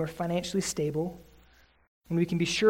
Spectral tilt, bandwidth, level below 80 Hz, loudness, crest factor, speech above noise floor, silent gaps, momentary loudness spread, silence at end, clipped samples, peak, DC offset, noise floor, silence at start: -5 dB/octave; 16 kHz; -58 dBFS; -30 LUFS; 18 dB; 32 dB; 1.88-2.01 s; 8 LU; 0 s; under 0.1%; -12 dBFS; under 0.1%; -60 dBFS; 0 s